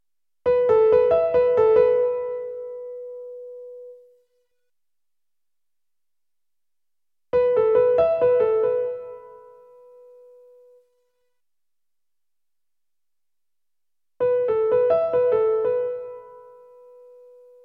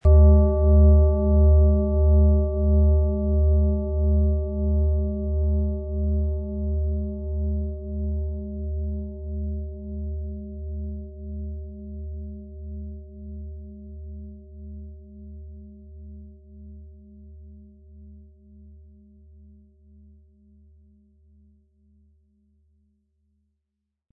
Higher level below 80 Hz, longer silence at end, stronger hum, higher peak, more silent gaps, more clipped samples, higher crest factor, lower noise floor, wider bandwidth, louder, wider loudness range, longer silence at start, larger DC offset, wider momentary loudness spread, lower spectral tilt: second, -60 dBFS vs -26 dBFS; second, 1.25 s vs 5.95 s; neither; about the same, -6 dBFS vs -6 dBFS; neither; neither; about the same, 18 dB vs 18 dB; first, -90 dBFS vs -80 dBFS; first, 4.3 kHz vs 1.2 kHz; first, -20 LUFS vs -23 LUFS; second, 16 LU vs 24 LU; first, 0.45 s vs 0.05 s; neither; second, 21 LU vs 25 LU; second, -7.5 dB/octave vs -15 dB/octave